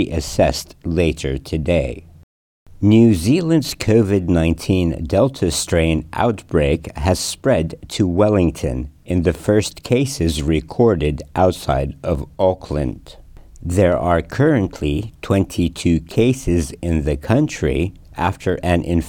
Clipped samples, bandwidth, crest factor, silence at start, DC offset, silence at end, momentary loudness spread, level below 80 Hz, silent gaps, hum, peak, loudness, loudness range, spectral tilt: under 0.1%; 18 kHz; 16 dB; 0 s; under 0.1%; 0 s; 8 LU; -34 dBFS; 2.23-2.66 s; none; -2 dBFS; -18 LUFS; 3 LU; -6 dB/octave